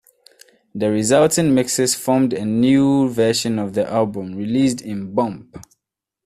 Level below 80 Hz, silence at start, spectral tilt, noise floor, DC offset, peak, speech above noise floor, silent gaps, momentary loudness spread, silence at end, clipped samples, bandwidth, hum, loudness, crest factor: -56 dBFS; 0.75 s; -5 dB/octave; -82 dBFS; under 0.1%; -2 dBFS; 64 dB; none; 9 LU; 0.65 s; under 0.1%; 15 kHz; none; -18 LUFS; 16 dB